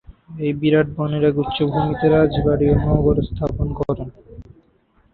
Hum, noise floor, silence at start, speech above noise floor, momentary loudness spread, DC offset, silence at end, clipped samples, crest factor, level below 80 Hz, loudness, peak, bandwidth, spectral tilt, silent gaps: none; -58 dBFS; 0.1 s; 40 dB; 9 LU; under 0.1%; 0.7 s; under 0.1%; 16 dB; -32 dBFS; -19 LUFS; -2 dBFS; 4.5 kHz; -10.5 dB/octave; none